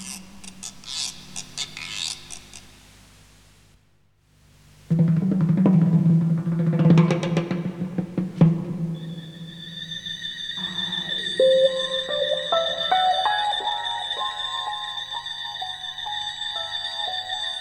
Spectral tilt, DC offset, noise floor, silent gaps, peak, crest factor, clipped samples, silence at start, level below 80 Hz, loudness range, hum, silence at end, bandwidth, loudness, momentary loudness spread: -5.5 dB/octave; under 0.1%; -62 dBFS; none; -4 dBFS; 20 dB; under 0.1%; 0 s; -58 dBFS; 12 LU; 50 Hz at -50 dBFS; 0 s; 12 kHz; -23 LUFS; 17 LU